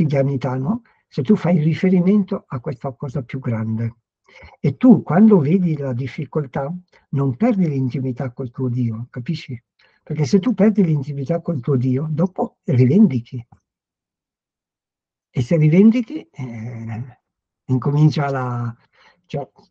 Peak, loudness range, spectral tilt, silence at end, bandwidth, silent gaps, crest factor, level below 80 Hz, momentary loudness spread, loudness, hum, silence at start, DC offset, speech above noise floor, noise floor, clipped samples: 0 dBFS; 5 LU; -9 dB/octave; 0.25 s; 7.2 kHz; none; 18 dB; -58 dBFS; 16 LU; -19 LUFS; none; 0 s; under 0.1%; 71 dB; -89 dBFS; under 0.1%